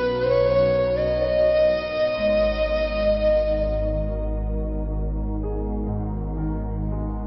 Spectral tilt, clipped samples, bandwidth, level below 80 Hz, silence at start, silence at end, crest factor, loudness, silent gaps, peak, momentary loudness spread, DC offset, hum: -11 dB/octave; under 0.1%; 5.8 kHz; -30 dBFS; 0 s; 0 s; 14 dB; -23 LUFS; none; -8 dBFS; 9 LU; under 0.1%; none